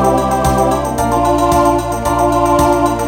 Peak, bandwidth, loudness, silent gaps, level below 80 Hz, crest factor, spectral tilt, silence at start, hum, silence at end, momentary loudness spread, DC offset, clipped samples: 0 dBFS; 17.5 kHz; -13 LUFS; none; -26 dBFS; 12 dB; -5.5 dB/octave; 0 s; none; 0 s; 4 LU; under 0.1%; under 0.1%